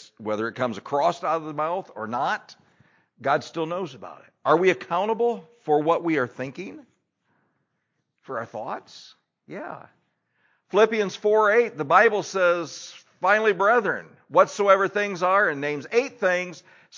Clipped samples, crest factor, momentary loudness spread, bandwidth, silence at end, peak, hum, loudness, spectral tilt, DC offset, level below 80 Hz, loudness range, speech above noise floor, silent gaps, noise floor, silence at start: under 0.1%; 22 dB; 16 LU; 7.6 kHz; 0 s; -4 dBFS; none; -23 LUFS; -5 dB/octave; under 0.1%; -78 dBFS; 16 LU; 53 dB; none; -76 dBFS; 0 s